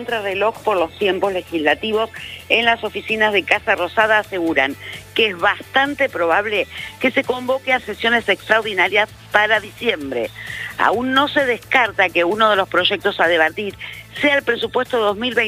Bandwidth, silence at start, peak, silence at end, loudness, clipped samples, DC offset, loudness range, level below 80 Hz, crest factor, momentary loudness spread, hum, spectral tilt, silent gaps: 16 kHz; 0 s; 0 dBFS; 0 s; -17 LUFS; under 0.1%; under 0.1%; 2 LU; -52 dBFS; 18 dB; 7 LU; none; -4 dB/octave; none